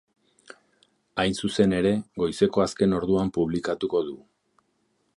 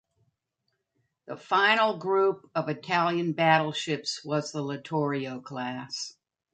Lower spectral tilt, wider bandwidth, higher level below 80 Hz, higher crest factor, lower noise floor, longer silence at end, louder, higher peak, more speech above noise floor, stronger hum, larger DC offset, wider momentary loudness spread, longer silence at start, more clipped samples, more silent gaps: first, -6 dB/octave vs -4.5 dB/octave; first, 11.5 kHz vs 9.2 kHz; first, -52 dBFS vs -76 dBFS; about the same, 20 dB vs 22 dB; second, -71 dBFS vs -80 dBFS; first, 1 s vs 0.45 s; about the same, -25 LUFS vs -27 LUFS; about the same, -6 dBFS vs -8 dBFS; second, 47 dB vs 52 dB; neither; neither; second, 7 LU vs 13 LU; second, 1.15 s vs 1.3 s; neither; neither